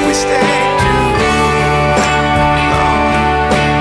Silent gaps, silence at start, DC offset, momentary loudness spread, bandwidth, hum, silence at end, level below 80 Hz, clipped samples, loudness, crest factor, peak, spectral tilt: none; 0 s; under 0.1%; 1 LU; 11 kHz; none; 0 s; -24 dBFS; under 0.1%; -12 LUFS; 12 dB; 0 dBFS; -4.5 dB/octave